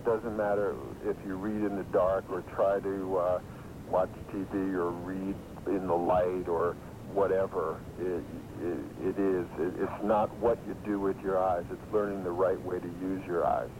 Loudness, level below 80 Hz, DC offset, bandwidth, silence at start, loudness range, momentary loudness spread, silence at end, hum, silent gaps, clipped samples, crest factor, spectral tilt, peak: -32 LUFS; -54 dBFS; under 0.1%; 16 kHz; 0 s; 2 LU; 8 LU; 0 s; none; none; under 0.1%; 16 dB; -8 dB/octave; -16 dBFS